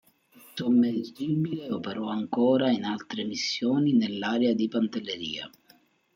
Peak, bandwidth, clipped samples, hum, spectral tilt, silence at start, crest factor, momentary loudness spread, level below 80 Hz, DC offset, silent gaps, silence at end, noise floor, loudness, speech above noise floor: -12 dBFS; 15.5 kHz; under 0.1%; none; -6 dB/octave; 0.55 s; 16 dB; 10 LU; -72 dBFS; under 0.1%; none; 0.65 s; -62 dBFS; -27 LUFS; 35 dB